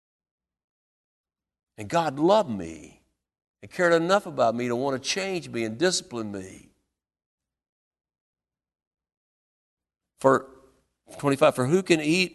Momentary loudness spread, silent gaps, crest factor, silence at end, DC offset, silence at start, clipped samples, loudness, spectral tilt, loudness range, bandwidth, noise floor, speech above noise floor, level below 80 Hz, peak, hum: 15 LU; 3.48-3.54 s, 7.26-7.38 s, 7.69-7.91 s, 8.21-8.33 s, 8.87-8.91 s, 9.17-9.77 s; 24 dB; 0.05 s; under 0.1%; 1.8 s; under 0.1%; -24 LUFS; -4.5 dB/octave; 7 LU; 12.5 kHz; -78 dBFS; 54 dB; -64 dBFS; -4 dBFS; none